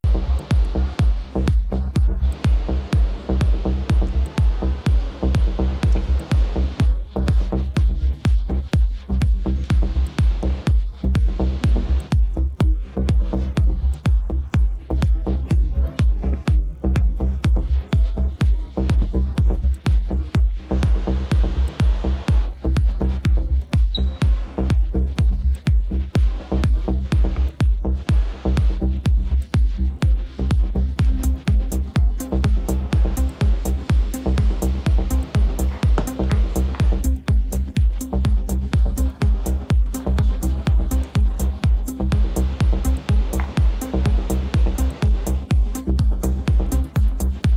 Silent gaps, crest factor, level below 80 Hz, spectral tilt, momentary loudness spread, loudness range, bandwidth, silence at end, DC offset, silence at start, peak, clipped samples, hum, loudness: none; 12 dB; -20 dBFS; -7 dB/octave; 2 LU; 0 LU; 14.5 kHz; 0 s; under 0.1%; 0.05 s; -6 dBFS; under 0.1%; none; -21 LUFS